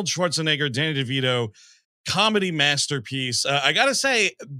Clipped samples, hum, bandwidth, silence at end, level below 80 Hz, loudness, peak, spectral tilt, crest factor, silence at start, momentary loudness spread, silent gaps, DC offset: under 0.1%; none; 15 kHz; 0 s; -68 dBFS; -21 LUFS; -2 dBFS; -3 dB/octave; 20 dB; 0 s; 7 LU; 1.85-2.04 s; under 0.1%